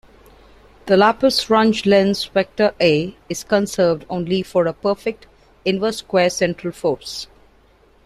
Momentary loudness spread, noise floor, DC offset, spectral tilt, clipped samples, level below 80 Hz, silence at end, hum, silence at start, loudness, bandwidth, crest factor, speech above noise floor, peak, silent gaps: 12 LU; -53 dBFS; under 0.1%; -5 dB/octave; under 0.1%; -52 dBFS; 0.8 s; none; 0.85 s; -18 LUFS; 14.5 kHz; 18 dB; 35 dB; -2 dBFS; none